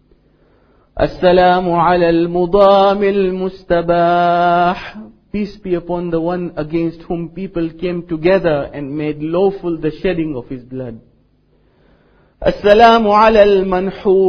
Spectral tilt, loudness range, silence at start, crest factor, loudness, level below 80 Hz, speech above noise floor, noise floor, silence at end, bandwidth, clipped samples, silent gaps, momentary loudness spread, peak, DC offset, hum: -8 dB/octave; 8 LU; 0.95 s; 14 dB; -14 LUFS; -38 dBFS; 41 dB; -55 dBFS; 0 s; 5.4 kHz; under 0.1%; none; 15 LU; 0 dBFS; under 0.1%; none